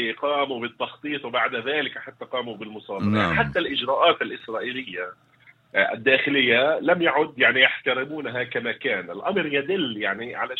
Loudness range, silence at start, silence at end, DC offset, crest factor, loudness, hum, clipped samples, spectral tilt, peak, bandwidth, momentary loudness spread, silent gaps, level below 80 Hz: 5 LU; 0 s; 0 s; under 0.1%; 22 dB; -23 LUFS; none; under 0.1%; -6.5 dB/octave; 0 dBFS; 8 kHz; 12 LU; none; -58 dBFS